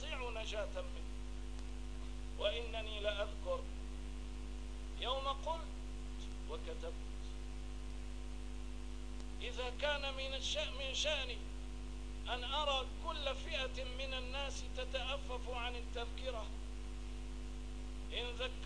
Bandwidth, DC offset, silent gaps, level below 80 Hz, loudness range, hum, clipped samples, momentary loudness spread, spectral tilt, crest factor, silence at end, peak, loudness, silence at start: 10.5 kHz; 0.3%; none; -46 dBFS; 6 LU; 50 Hz at -45 dBFS; under 0.1%; 11 LU; -3.5 dB/octave; 18 dB; 0 s; -24 dBFS; -43 LUFS; 0 s